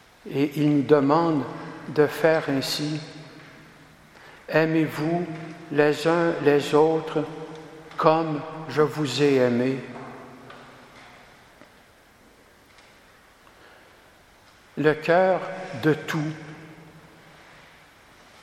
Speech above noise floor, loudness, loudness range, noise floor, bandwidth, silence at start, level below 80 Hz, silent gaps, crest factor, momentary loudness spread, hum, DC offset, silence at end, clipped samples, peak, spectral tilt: 32 dB; -23 LUFS; 5 LU; -54 dBFS; 16 kHz; 0.25 s; -66 dBFS; none; 22 dB; 21 LU; none; under 0.1%; 1.45 s; under 0.1%; -2 dBFS; -6 dB/octave